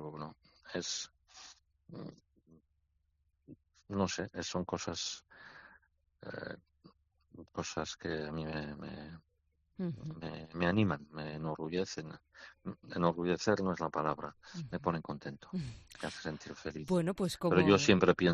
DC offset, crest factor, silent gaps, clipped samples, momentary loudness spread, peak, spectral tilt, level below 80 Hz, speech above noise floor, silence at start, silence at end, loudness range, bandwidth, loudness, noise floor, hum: under 0.1%; 26 dB; none; under 0.1%; 21 LU; -10 dBFS; -5 dB/octave; -64 dBFS; 42 dB; 0 s; 0 s; 9 LU; 8.2 kHz; -36 LUFS; -78 dBFS; none